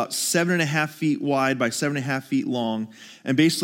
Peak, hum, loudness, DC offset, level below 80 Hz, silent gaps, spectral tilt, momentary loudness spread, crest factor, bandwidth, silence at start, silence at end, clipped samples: -8 dBFS; none; -23 LUFS; under 0.1%; -72 dBFS; none; -4.5 dB/octave; 7 LU; 16 dB; 17 kHz; 0 s; 0 s; under 0.1%